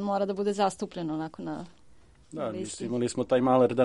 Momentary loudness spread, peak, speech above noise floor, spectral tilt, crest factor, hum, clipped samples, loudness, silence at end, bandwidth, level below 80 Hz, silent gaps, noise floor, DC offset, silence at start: 15 LU; -10 dBFS; 30 dB; -6 dB/octave; 18 dB; none; under 0.1%; -29 LUFS; 0 s; 11.5 kHz; -64 dBFS; none; -57 dBFS; under 0.1%; 0 s